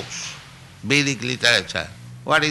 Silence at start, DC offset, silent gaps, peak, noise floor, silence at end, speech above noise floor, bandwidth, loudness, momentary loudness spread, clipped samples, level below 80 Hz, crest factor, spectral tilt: 0 s; under 0.1%; none; -4 dBFS; -42 dBFS; 0 s; 21 dB; 12 kHz; -20 LUFS; 18 LU; under 0.1%; -54 dBFS; 20 dB; -3 dB/octave